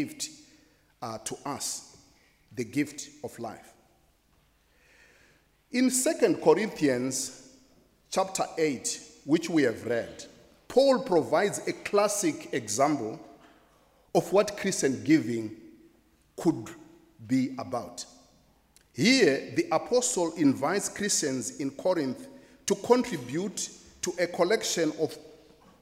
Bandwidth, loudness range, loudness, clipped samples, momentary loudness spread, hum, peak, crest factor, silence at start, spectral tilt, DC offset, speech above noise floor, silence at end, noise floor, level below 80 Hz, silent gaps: 16 kHz; 9 LU; -28 LUFS; under 0.1%; 15 LU; none; -8 dBFS; 22 dB; 0 s; -4 dB/octave; under 0.1%; 39 dB; 0.5 s; -66 dBFS; -68 dBFS; none